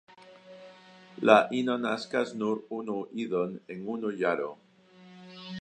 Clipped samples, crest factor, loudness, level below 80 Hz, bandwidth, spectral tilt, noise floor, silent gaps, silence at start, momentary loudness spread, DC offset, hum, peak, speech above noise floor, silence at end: under 0.1%; 26 dB; -29 LUFS; -80 dBFS; 9.6 kHz; -5.5 dB/octave; -55 dBFS; none; 0.2 s; 26 LU; under 0.1%; none; -4 dBFS; 27 dB; 0 s